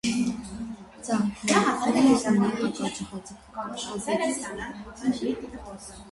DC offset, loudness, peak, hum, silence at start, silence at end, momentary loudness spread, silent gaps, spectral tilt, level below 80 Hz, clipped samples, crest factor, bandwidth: under 0.1%; -26 LUFS; -8 dBFS; none; 0.05 s; 0 s; 18 LU; none; -4.5 dB/octave; -54 dBFS; under 0.1%; 20 dB; 11.5 kHz